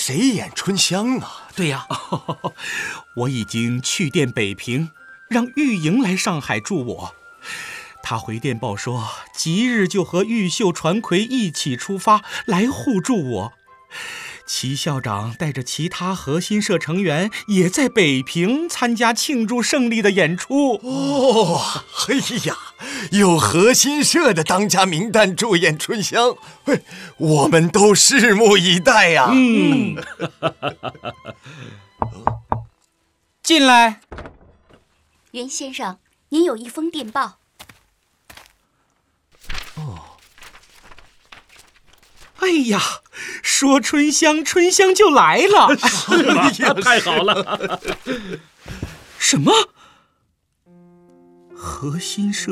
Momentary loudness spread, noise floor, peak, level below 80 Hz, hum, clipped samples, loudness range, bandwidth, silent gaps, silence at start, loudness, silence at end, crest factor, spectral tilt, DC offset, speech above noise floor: 18 LU; -67 dBFS; 0 dBFS; -50 dBFS; none; under 0.1%; 12 LU; 15.5 kHz; none; 0 s; -17 LUFS; 0 s; 18 dB; -3.5 dB/octave; under 0.1%; 49 dB